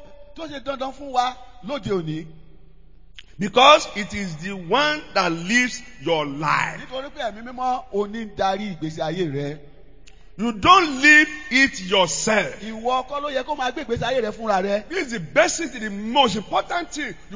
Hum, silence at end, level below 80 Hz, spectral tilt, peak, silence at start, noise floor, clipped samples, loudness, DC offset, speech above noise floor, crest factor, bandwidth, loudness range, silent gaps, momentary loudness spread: none; 0 s; -50 dBFS; -3 dB/octave; 0 dBFS; 0 s; -50 dBFS; under 0.1%; -21 LUFS; 0.8%; 28 dB; 22 dB; 7.8 kHz; 10 LU; none; 16 LU